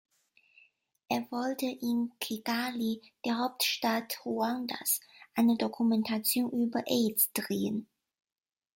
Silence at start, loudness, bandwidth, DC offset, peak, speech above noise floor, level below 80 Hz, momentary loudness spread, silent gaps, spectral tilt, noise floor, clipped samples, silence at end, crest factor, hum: 1.1 s; -31 LUFS; 16.5 kHz; under 0.1%; -14 dBFS; 34 dB; -76 dBFS; 7 LU; none; -3.5 dB/octave; -65 dBFS; under 0.1%; 0.95 s; 18 dB; none